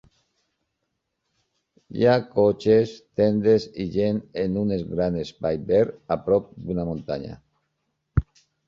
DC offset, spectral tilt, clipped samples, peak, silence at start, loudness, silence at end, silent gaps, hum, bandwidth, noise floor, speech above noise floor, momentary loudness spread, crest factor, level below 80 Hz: under 0.1%; -8 dB/octave; under 0.1%; -6 dBFS; 1.9 s; -23 LUFS; 0.45 s; none; none; 7.4 kHz; -78 dBFS; 56 dB; 9 LU; 18 dB; -44 dBFS